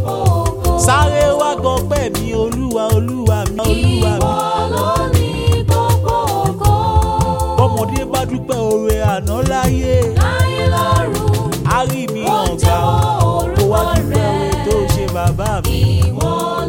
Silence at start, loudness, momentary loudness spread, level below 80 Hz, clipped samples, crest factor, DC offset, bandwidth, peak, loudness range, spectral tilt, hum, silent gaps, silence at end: 0 s; -15 LUFS; 4 LU; -24 dBFS; under 0.1%; 14 dB; under 0.1%; 17 kHz; 0 dBFS; 1 LU; -5.5 dB/octave; none; none; 0 s